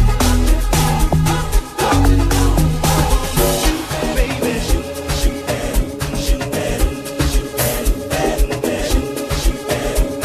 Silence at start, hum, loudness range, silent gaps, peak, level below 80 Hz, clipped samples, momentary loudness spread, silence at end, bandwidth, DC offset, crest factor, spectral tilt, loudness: 0 s; none; 4 LU; none; -2 dBFS; -18 dBFS; under 0.1%; 6 LU; 0 s; 15 kHz; under 0.1%; 14 dB; -4.5 dB/octave; -18 LUFS